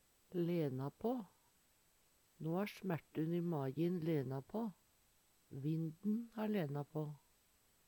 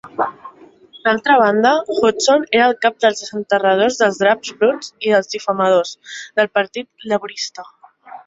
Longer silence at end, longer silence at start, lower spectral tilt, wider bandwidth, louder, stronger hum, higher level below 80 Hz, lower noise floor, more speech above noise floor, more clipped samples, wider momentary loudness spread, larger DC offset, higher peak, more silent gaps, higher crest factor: first, 0.7 s vs 0.1 s; first, 0.3 s vs 0.05 s; first, -8.5 dB/octave vs -3.5 dB/octave; first, 19 kHz vs 7.8 kHz; second, -42 LUFS vs -16 LUFS; neither; second, -80 dBFS vs -62 dBFS; first, -74 dBFS vs -44 dBFS; first, 33 dB vs 28 dB; neither; second, 8 LU vs 12 LU; neither; second, -26 dBFS vs -2 dBFS; neither; about the same, 16 dB vs 16 dB